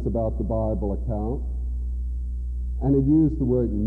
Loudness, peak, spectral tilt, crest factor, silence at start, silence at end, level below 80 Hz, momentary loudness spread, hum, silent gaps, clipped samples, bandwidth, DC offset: -25 LUFS; -10 dBFS; -13 dB/octave; 14 dB; 0 s; 0 s; -28 dBFS; 11 LU; 60 Hz at -30 dBFS; none; under 0.1%; 1.7 kHz; under 0.1%